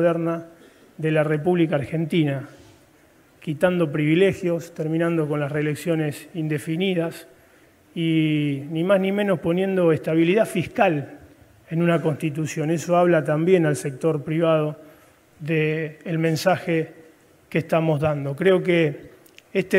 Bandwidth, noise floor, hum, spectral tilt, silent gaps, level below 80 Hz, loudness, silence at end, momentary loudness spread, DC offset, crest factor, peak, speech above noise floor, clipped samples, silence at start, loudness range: 16 kHz; -55 dBFS; none; -7 dB/octave; none; -62 dBFS; -22 LUFS; 0 s; 10 LU; under 0.1%; 18 dB; -4 dBFS; 34 dB; under 0.1%; 0 s; 4 LU